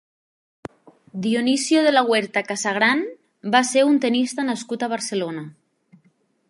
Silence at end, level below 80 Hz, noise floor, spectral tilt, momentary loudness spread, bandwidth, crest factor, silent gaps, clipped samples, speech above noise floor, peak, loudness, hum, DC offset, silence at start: 1 s; -72 dBFS; -63 dBFS; -3.5 dB/octave; 20 LU; 11.5 kHz; 20 dB; none; under 0.1%; 43 dB; -2 dBFS; -20 LUFS; none; under 0.1%; 1.15 s